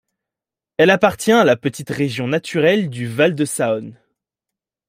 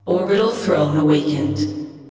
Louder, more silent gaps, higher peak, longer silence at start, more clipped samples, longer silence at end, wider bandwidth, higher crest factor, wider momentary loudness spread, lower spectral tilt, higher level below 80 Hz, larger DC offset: about the same, -17 LUFS vs -18 LUFS; neither; first, 0 dBFS vs -4 dBFS; first, 0.8 s vs 0.05 s; neither; first, 0.95 s vs 0 s; first, 16 kHz vs 8 kHz; about the same, 18 dB vs 14 dB; about the same, 10 LU vs 8 LU; second, -5 dB/octave vs -7 dB/octave; second, -60 dBFS vs -50 dBFS; second, under 0.1% vs 0.1%